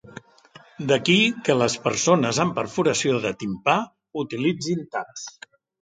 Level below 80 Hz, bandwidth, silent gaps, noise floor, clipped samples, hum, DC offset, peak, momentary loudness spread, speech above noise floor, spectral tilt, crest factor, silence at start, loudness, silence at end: -62 dBFS; 9.6 kHz; none; -51 dBFS; under 0.1%; none; under 0.1%; -4 dBFS; 14 LU; 29 dB; -4 dB/octave; 20 dB; 0.05 s; -22 LUFS; 0.55 s